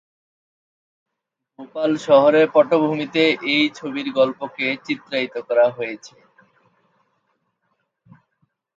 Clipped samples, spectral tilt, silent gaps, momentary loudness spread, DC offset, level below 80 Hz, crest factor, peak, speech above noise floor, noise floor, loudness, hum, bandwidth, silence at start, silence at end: under 0.1%; -5.5 dB/octave; none; 12 LU; under 0.1%; -72 dBFS; 20 dB; -2 dBFS; 62 dB; -81 dBFS; -19 LUFS; none; 7.8 kHz; 1.6 s; 2.7 s